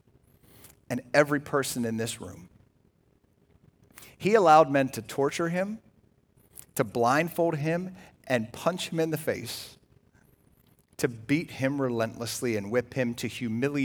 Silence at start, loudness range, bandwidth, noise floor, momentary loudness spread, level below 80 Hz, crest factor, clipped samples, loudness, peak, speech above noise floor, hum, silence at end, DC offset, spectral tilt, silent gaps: 0.9 s; 6 LU; over 20 kHz; -66 dBFS; 13 LU; -66 dBFS; 22 dB; under 0.1%; -27 LUFS; -6 dBFS; 39 dB; none; 0 s; under 0.1%; -5 dB/octave; none